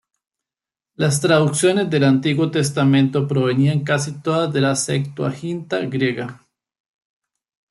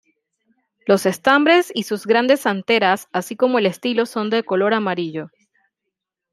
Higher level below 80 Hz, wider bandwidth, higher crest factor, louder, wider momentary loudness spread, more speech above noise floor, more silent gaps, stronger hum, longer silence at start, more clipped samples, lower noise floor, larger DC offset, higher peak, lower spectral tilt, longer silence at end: first, -60 dBFS vs -68 dBFS; second, 12 kHz vs 15.5 kHz; about the same, 18 dB vs 18 dB; about the same, -19 LUFS vs -18 LUFS; about the same, 8 LU vs 10 LU; first, 71 dB vs 63 dB; neither; neither; first, 1 s vs 0.85 s; neither; first, -89 dBFS vs -81 dBFS; neither; about the same, -2 dBFS vs -2 dBFS; about the same, -5.5 dB/octave vs -4.5 dB/octave; first, 1.35 s vs 1.05 s